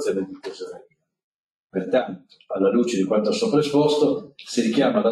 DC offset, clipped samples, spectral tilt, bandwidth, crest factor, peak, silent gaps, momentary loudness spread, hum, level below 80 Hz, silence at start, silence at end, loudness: under 0.1%; under 0.1%; -5.5 dB/octave; 12.5 kHz; 16 dB; -6 dBFS; 1.24-1.69 s; 15 LU; none; -66 dBFS; 0 s; 0 s; -22 LUFS